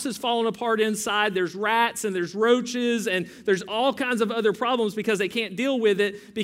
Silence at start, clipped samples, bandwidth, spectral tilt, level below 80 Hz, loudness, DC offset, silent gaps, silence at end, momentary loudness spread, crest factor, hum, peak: 0 s; under 0.1%; 16 kHz; -3.5 dB/octave; -70 dBFS; -24 LUFS; under 0.1%; none; 0 s; 4 LU; 16 dB; none; -8 dBFS